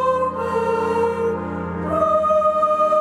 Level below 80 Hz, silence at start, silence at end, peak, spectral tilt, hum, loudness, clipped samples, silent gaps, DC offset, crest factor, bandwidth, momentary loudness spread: -48 dBFS; 0 s; 0 s; -8 dBFS; -7 dB/octave; none; -20 LUFS; under 0.1%; none; under 0.1%; 12 dB; 12.5 kHz; 8 LU